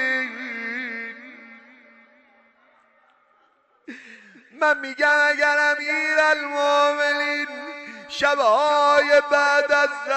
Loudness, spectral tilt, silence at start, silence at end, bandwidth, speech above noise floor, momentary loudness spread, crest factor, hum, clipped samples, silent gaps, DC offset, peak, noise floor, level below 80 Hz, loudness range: -19 LUFS; -1 dB/octave; 0 s; 0 s; 8.6 kHz; 43 dB; 17 LU; 14 dB; none; under 0.1%; none; under 0.1%; -8 dBFS; -62 dBFS; -68 dBFS; 15 LU